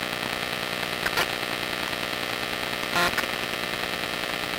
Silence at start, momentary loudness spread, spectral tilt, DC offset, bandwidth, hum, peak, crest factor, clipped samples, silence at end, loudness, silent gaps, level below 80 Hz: 0 s; 4 LU; -2.5 dB/octave; under 0.1%; 17 kHz; 60 Hz at -45 dBFS; -12 dBFS; 16 dB; under 0.1%; 0 s; -26 LUFS; none; -52 dBFS